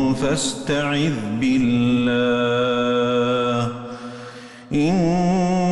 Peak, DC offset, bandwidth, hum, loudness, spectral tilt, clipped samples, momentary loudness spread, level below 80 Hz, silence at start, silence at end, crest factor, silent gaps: -10 dBFS; under 0.1%; 12 kHz; none; -20 LUFS; -5.5 dB/octave; under 0.1%; 15 LU; -46 dBFS; 0 s; 0 s; 10 dB; none